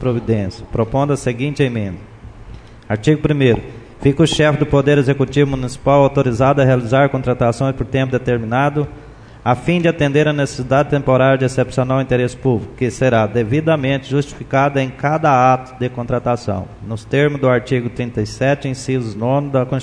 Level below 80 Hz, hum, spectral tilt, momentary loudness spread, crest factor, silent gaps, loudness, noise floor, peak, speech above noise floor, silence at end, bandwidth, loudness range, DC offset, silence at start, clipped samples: -38 dBFS; none; -7 dB/octave; 8 LU; 16 dB; none; -16 LUFS; -36 dBFS; 0 dBFS; 20 dB; 0 s; 10.5 kHz; 4 LU; under 0.1%; 0 s; under 0.1%